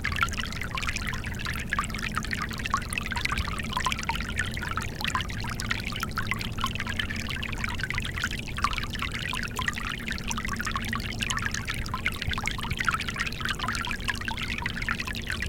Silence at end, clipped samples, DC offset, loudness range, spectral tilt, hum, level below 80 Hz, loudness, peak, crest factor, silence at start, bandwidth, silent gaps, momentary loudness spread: 0 s; under 0.1%; under 0.1%; 1 LU; -3.5 dB/octave; none; -38 dBFS; -30 LUFS; -6 dBFS; 24 dB; 0 s; 17 kHz; none; 3 LU